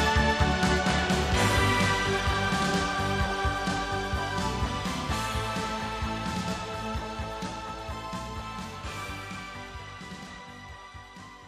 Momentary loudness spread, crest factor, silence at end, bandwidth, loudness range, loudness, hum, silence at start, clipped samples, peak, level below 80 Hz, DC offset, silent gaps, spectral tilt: 17 LU; 20 dB; 0 s; 15.5 kHz; 12 LU; -28 LUFS; none; 0 s; under 0.1%; -10 dBFS; -38 dBFS; under 0.1%; none; -4.5 dB/octave